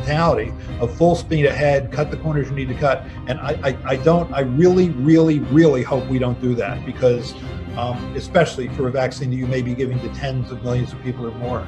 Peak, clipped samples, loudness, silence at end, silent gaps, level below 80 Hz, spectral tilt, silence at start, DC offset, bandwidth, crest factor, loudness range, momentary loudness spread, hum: 0 dBFS; under 0.1%; -19 LUFS; 0 s; none; -38 dBFS; -7.5 dB/octave; 0 s; under 0.1%; 9.8 kHz; 18 dB; 5 LU; 11 LU; none